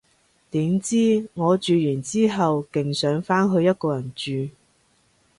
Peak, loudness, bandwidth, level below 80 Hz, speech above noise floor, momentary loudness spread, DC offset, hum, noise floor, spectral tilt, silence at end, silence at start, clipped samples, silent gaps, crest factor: -8 dBFS; -22 LUFS; 11.5 kHz; -62 dBFS; 41 dB; 9 LU; under 0.1%; none; -63 dBFS; -6 dB/octave; 0.9 s; 0.55 s; under 0.1%; none; 16 dB